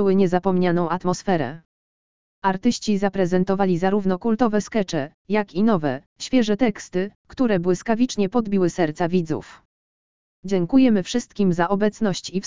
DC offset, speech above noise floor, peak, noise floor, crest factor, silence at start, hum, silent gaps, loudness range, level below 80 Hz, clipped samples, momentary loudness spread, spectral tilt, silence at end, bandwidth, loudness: 1%; over 69 dB; -4 dBFS; under -90 dBFS; 16 dB; 0 s; none; 1.65-2.42 s, 5.14-5.25 s, 6.06-6.16 s, 7.15-7.25 s, 9.65-10.43 s; 1 LU; -52 dBFS; under 0.1%; 8 LU; -6.5 dB/octave; 0 s; 7.6 kHz; -22 LUFS